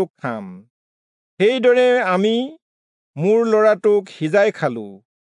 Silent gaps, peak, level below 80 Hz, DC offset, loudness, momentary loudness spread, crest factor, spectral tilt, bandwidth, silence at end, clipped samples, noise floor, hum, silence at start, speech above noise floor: 0.10-0.14 s, 0.70-1.37 s, 2.62-3.14 s; -4 dBFS; -78 dBFS; under 0.1%; -17 LUFS; 17 LU; 14 dB; -6 dB/octave; 10.5 kHz; 0.35 s; under 0.1%; under -90 dBFS; none; 0 s; over 73 dB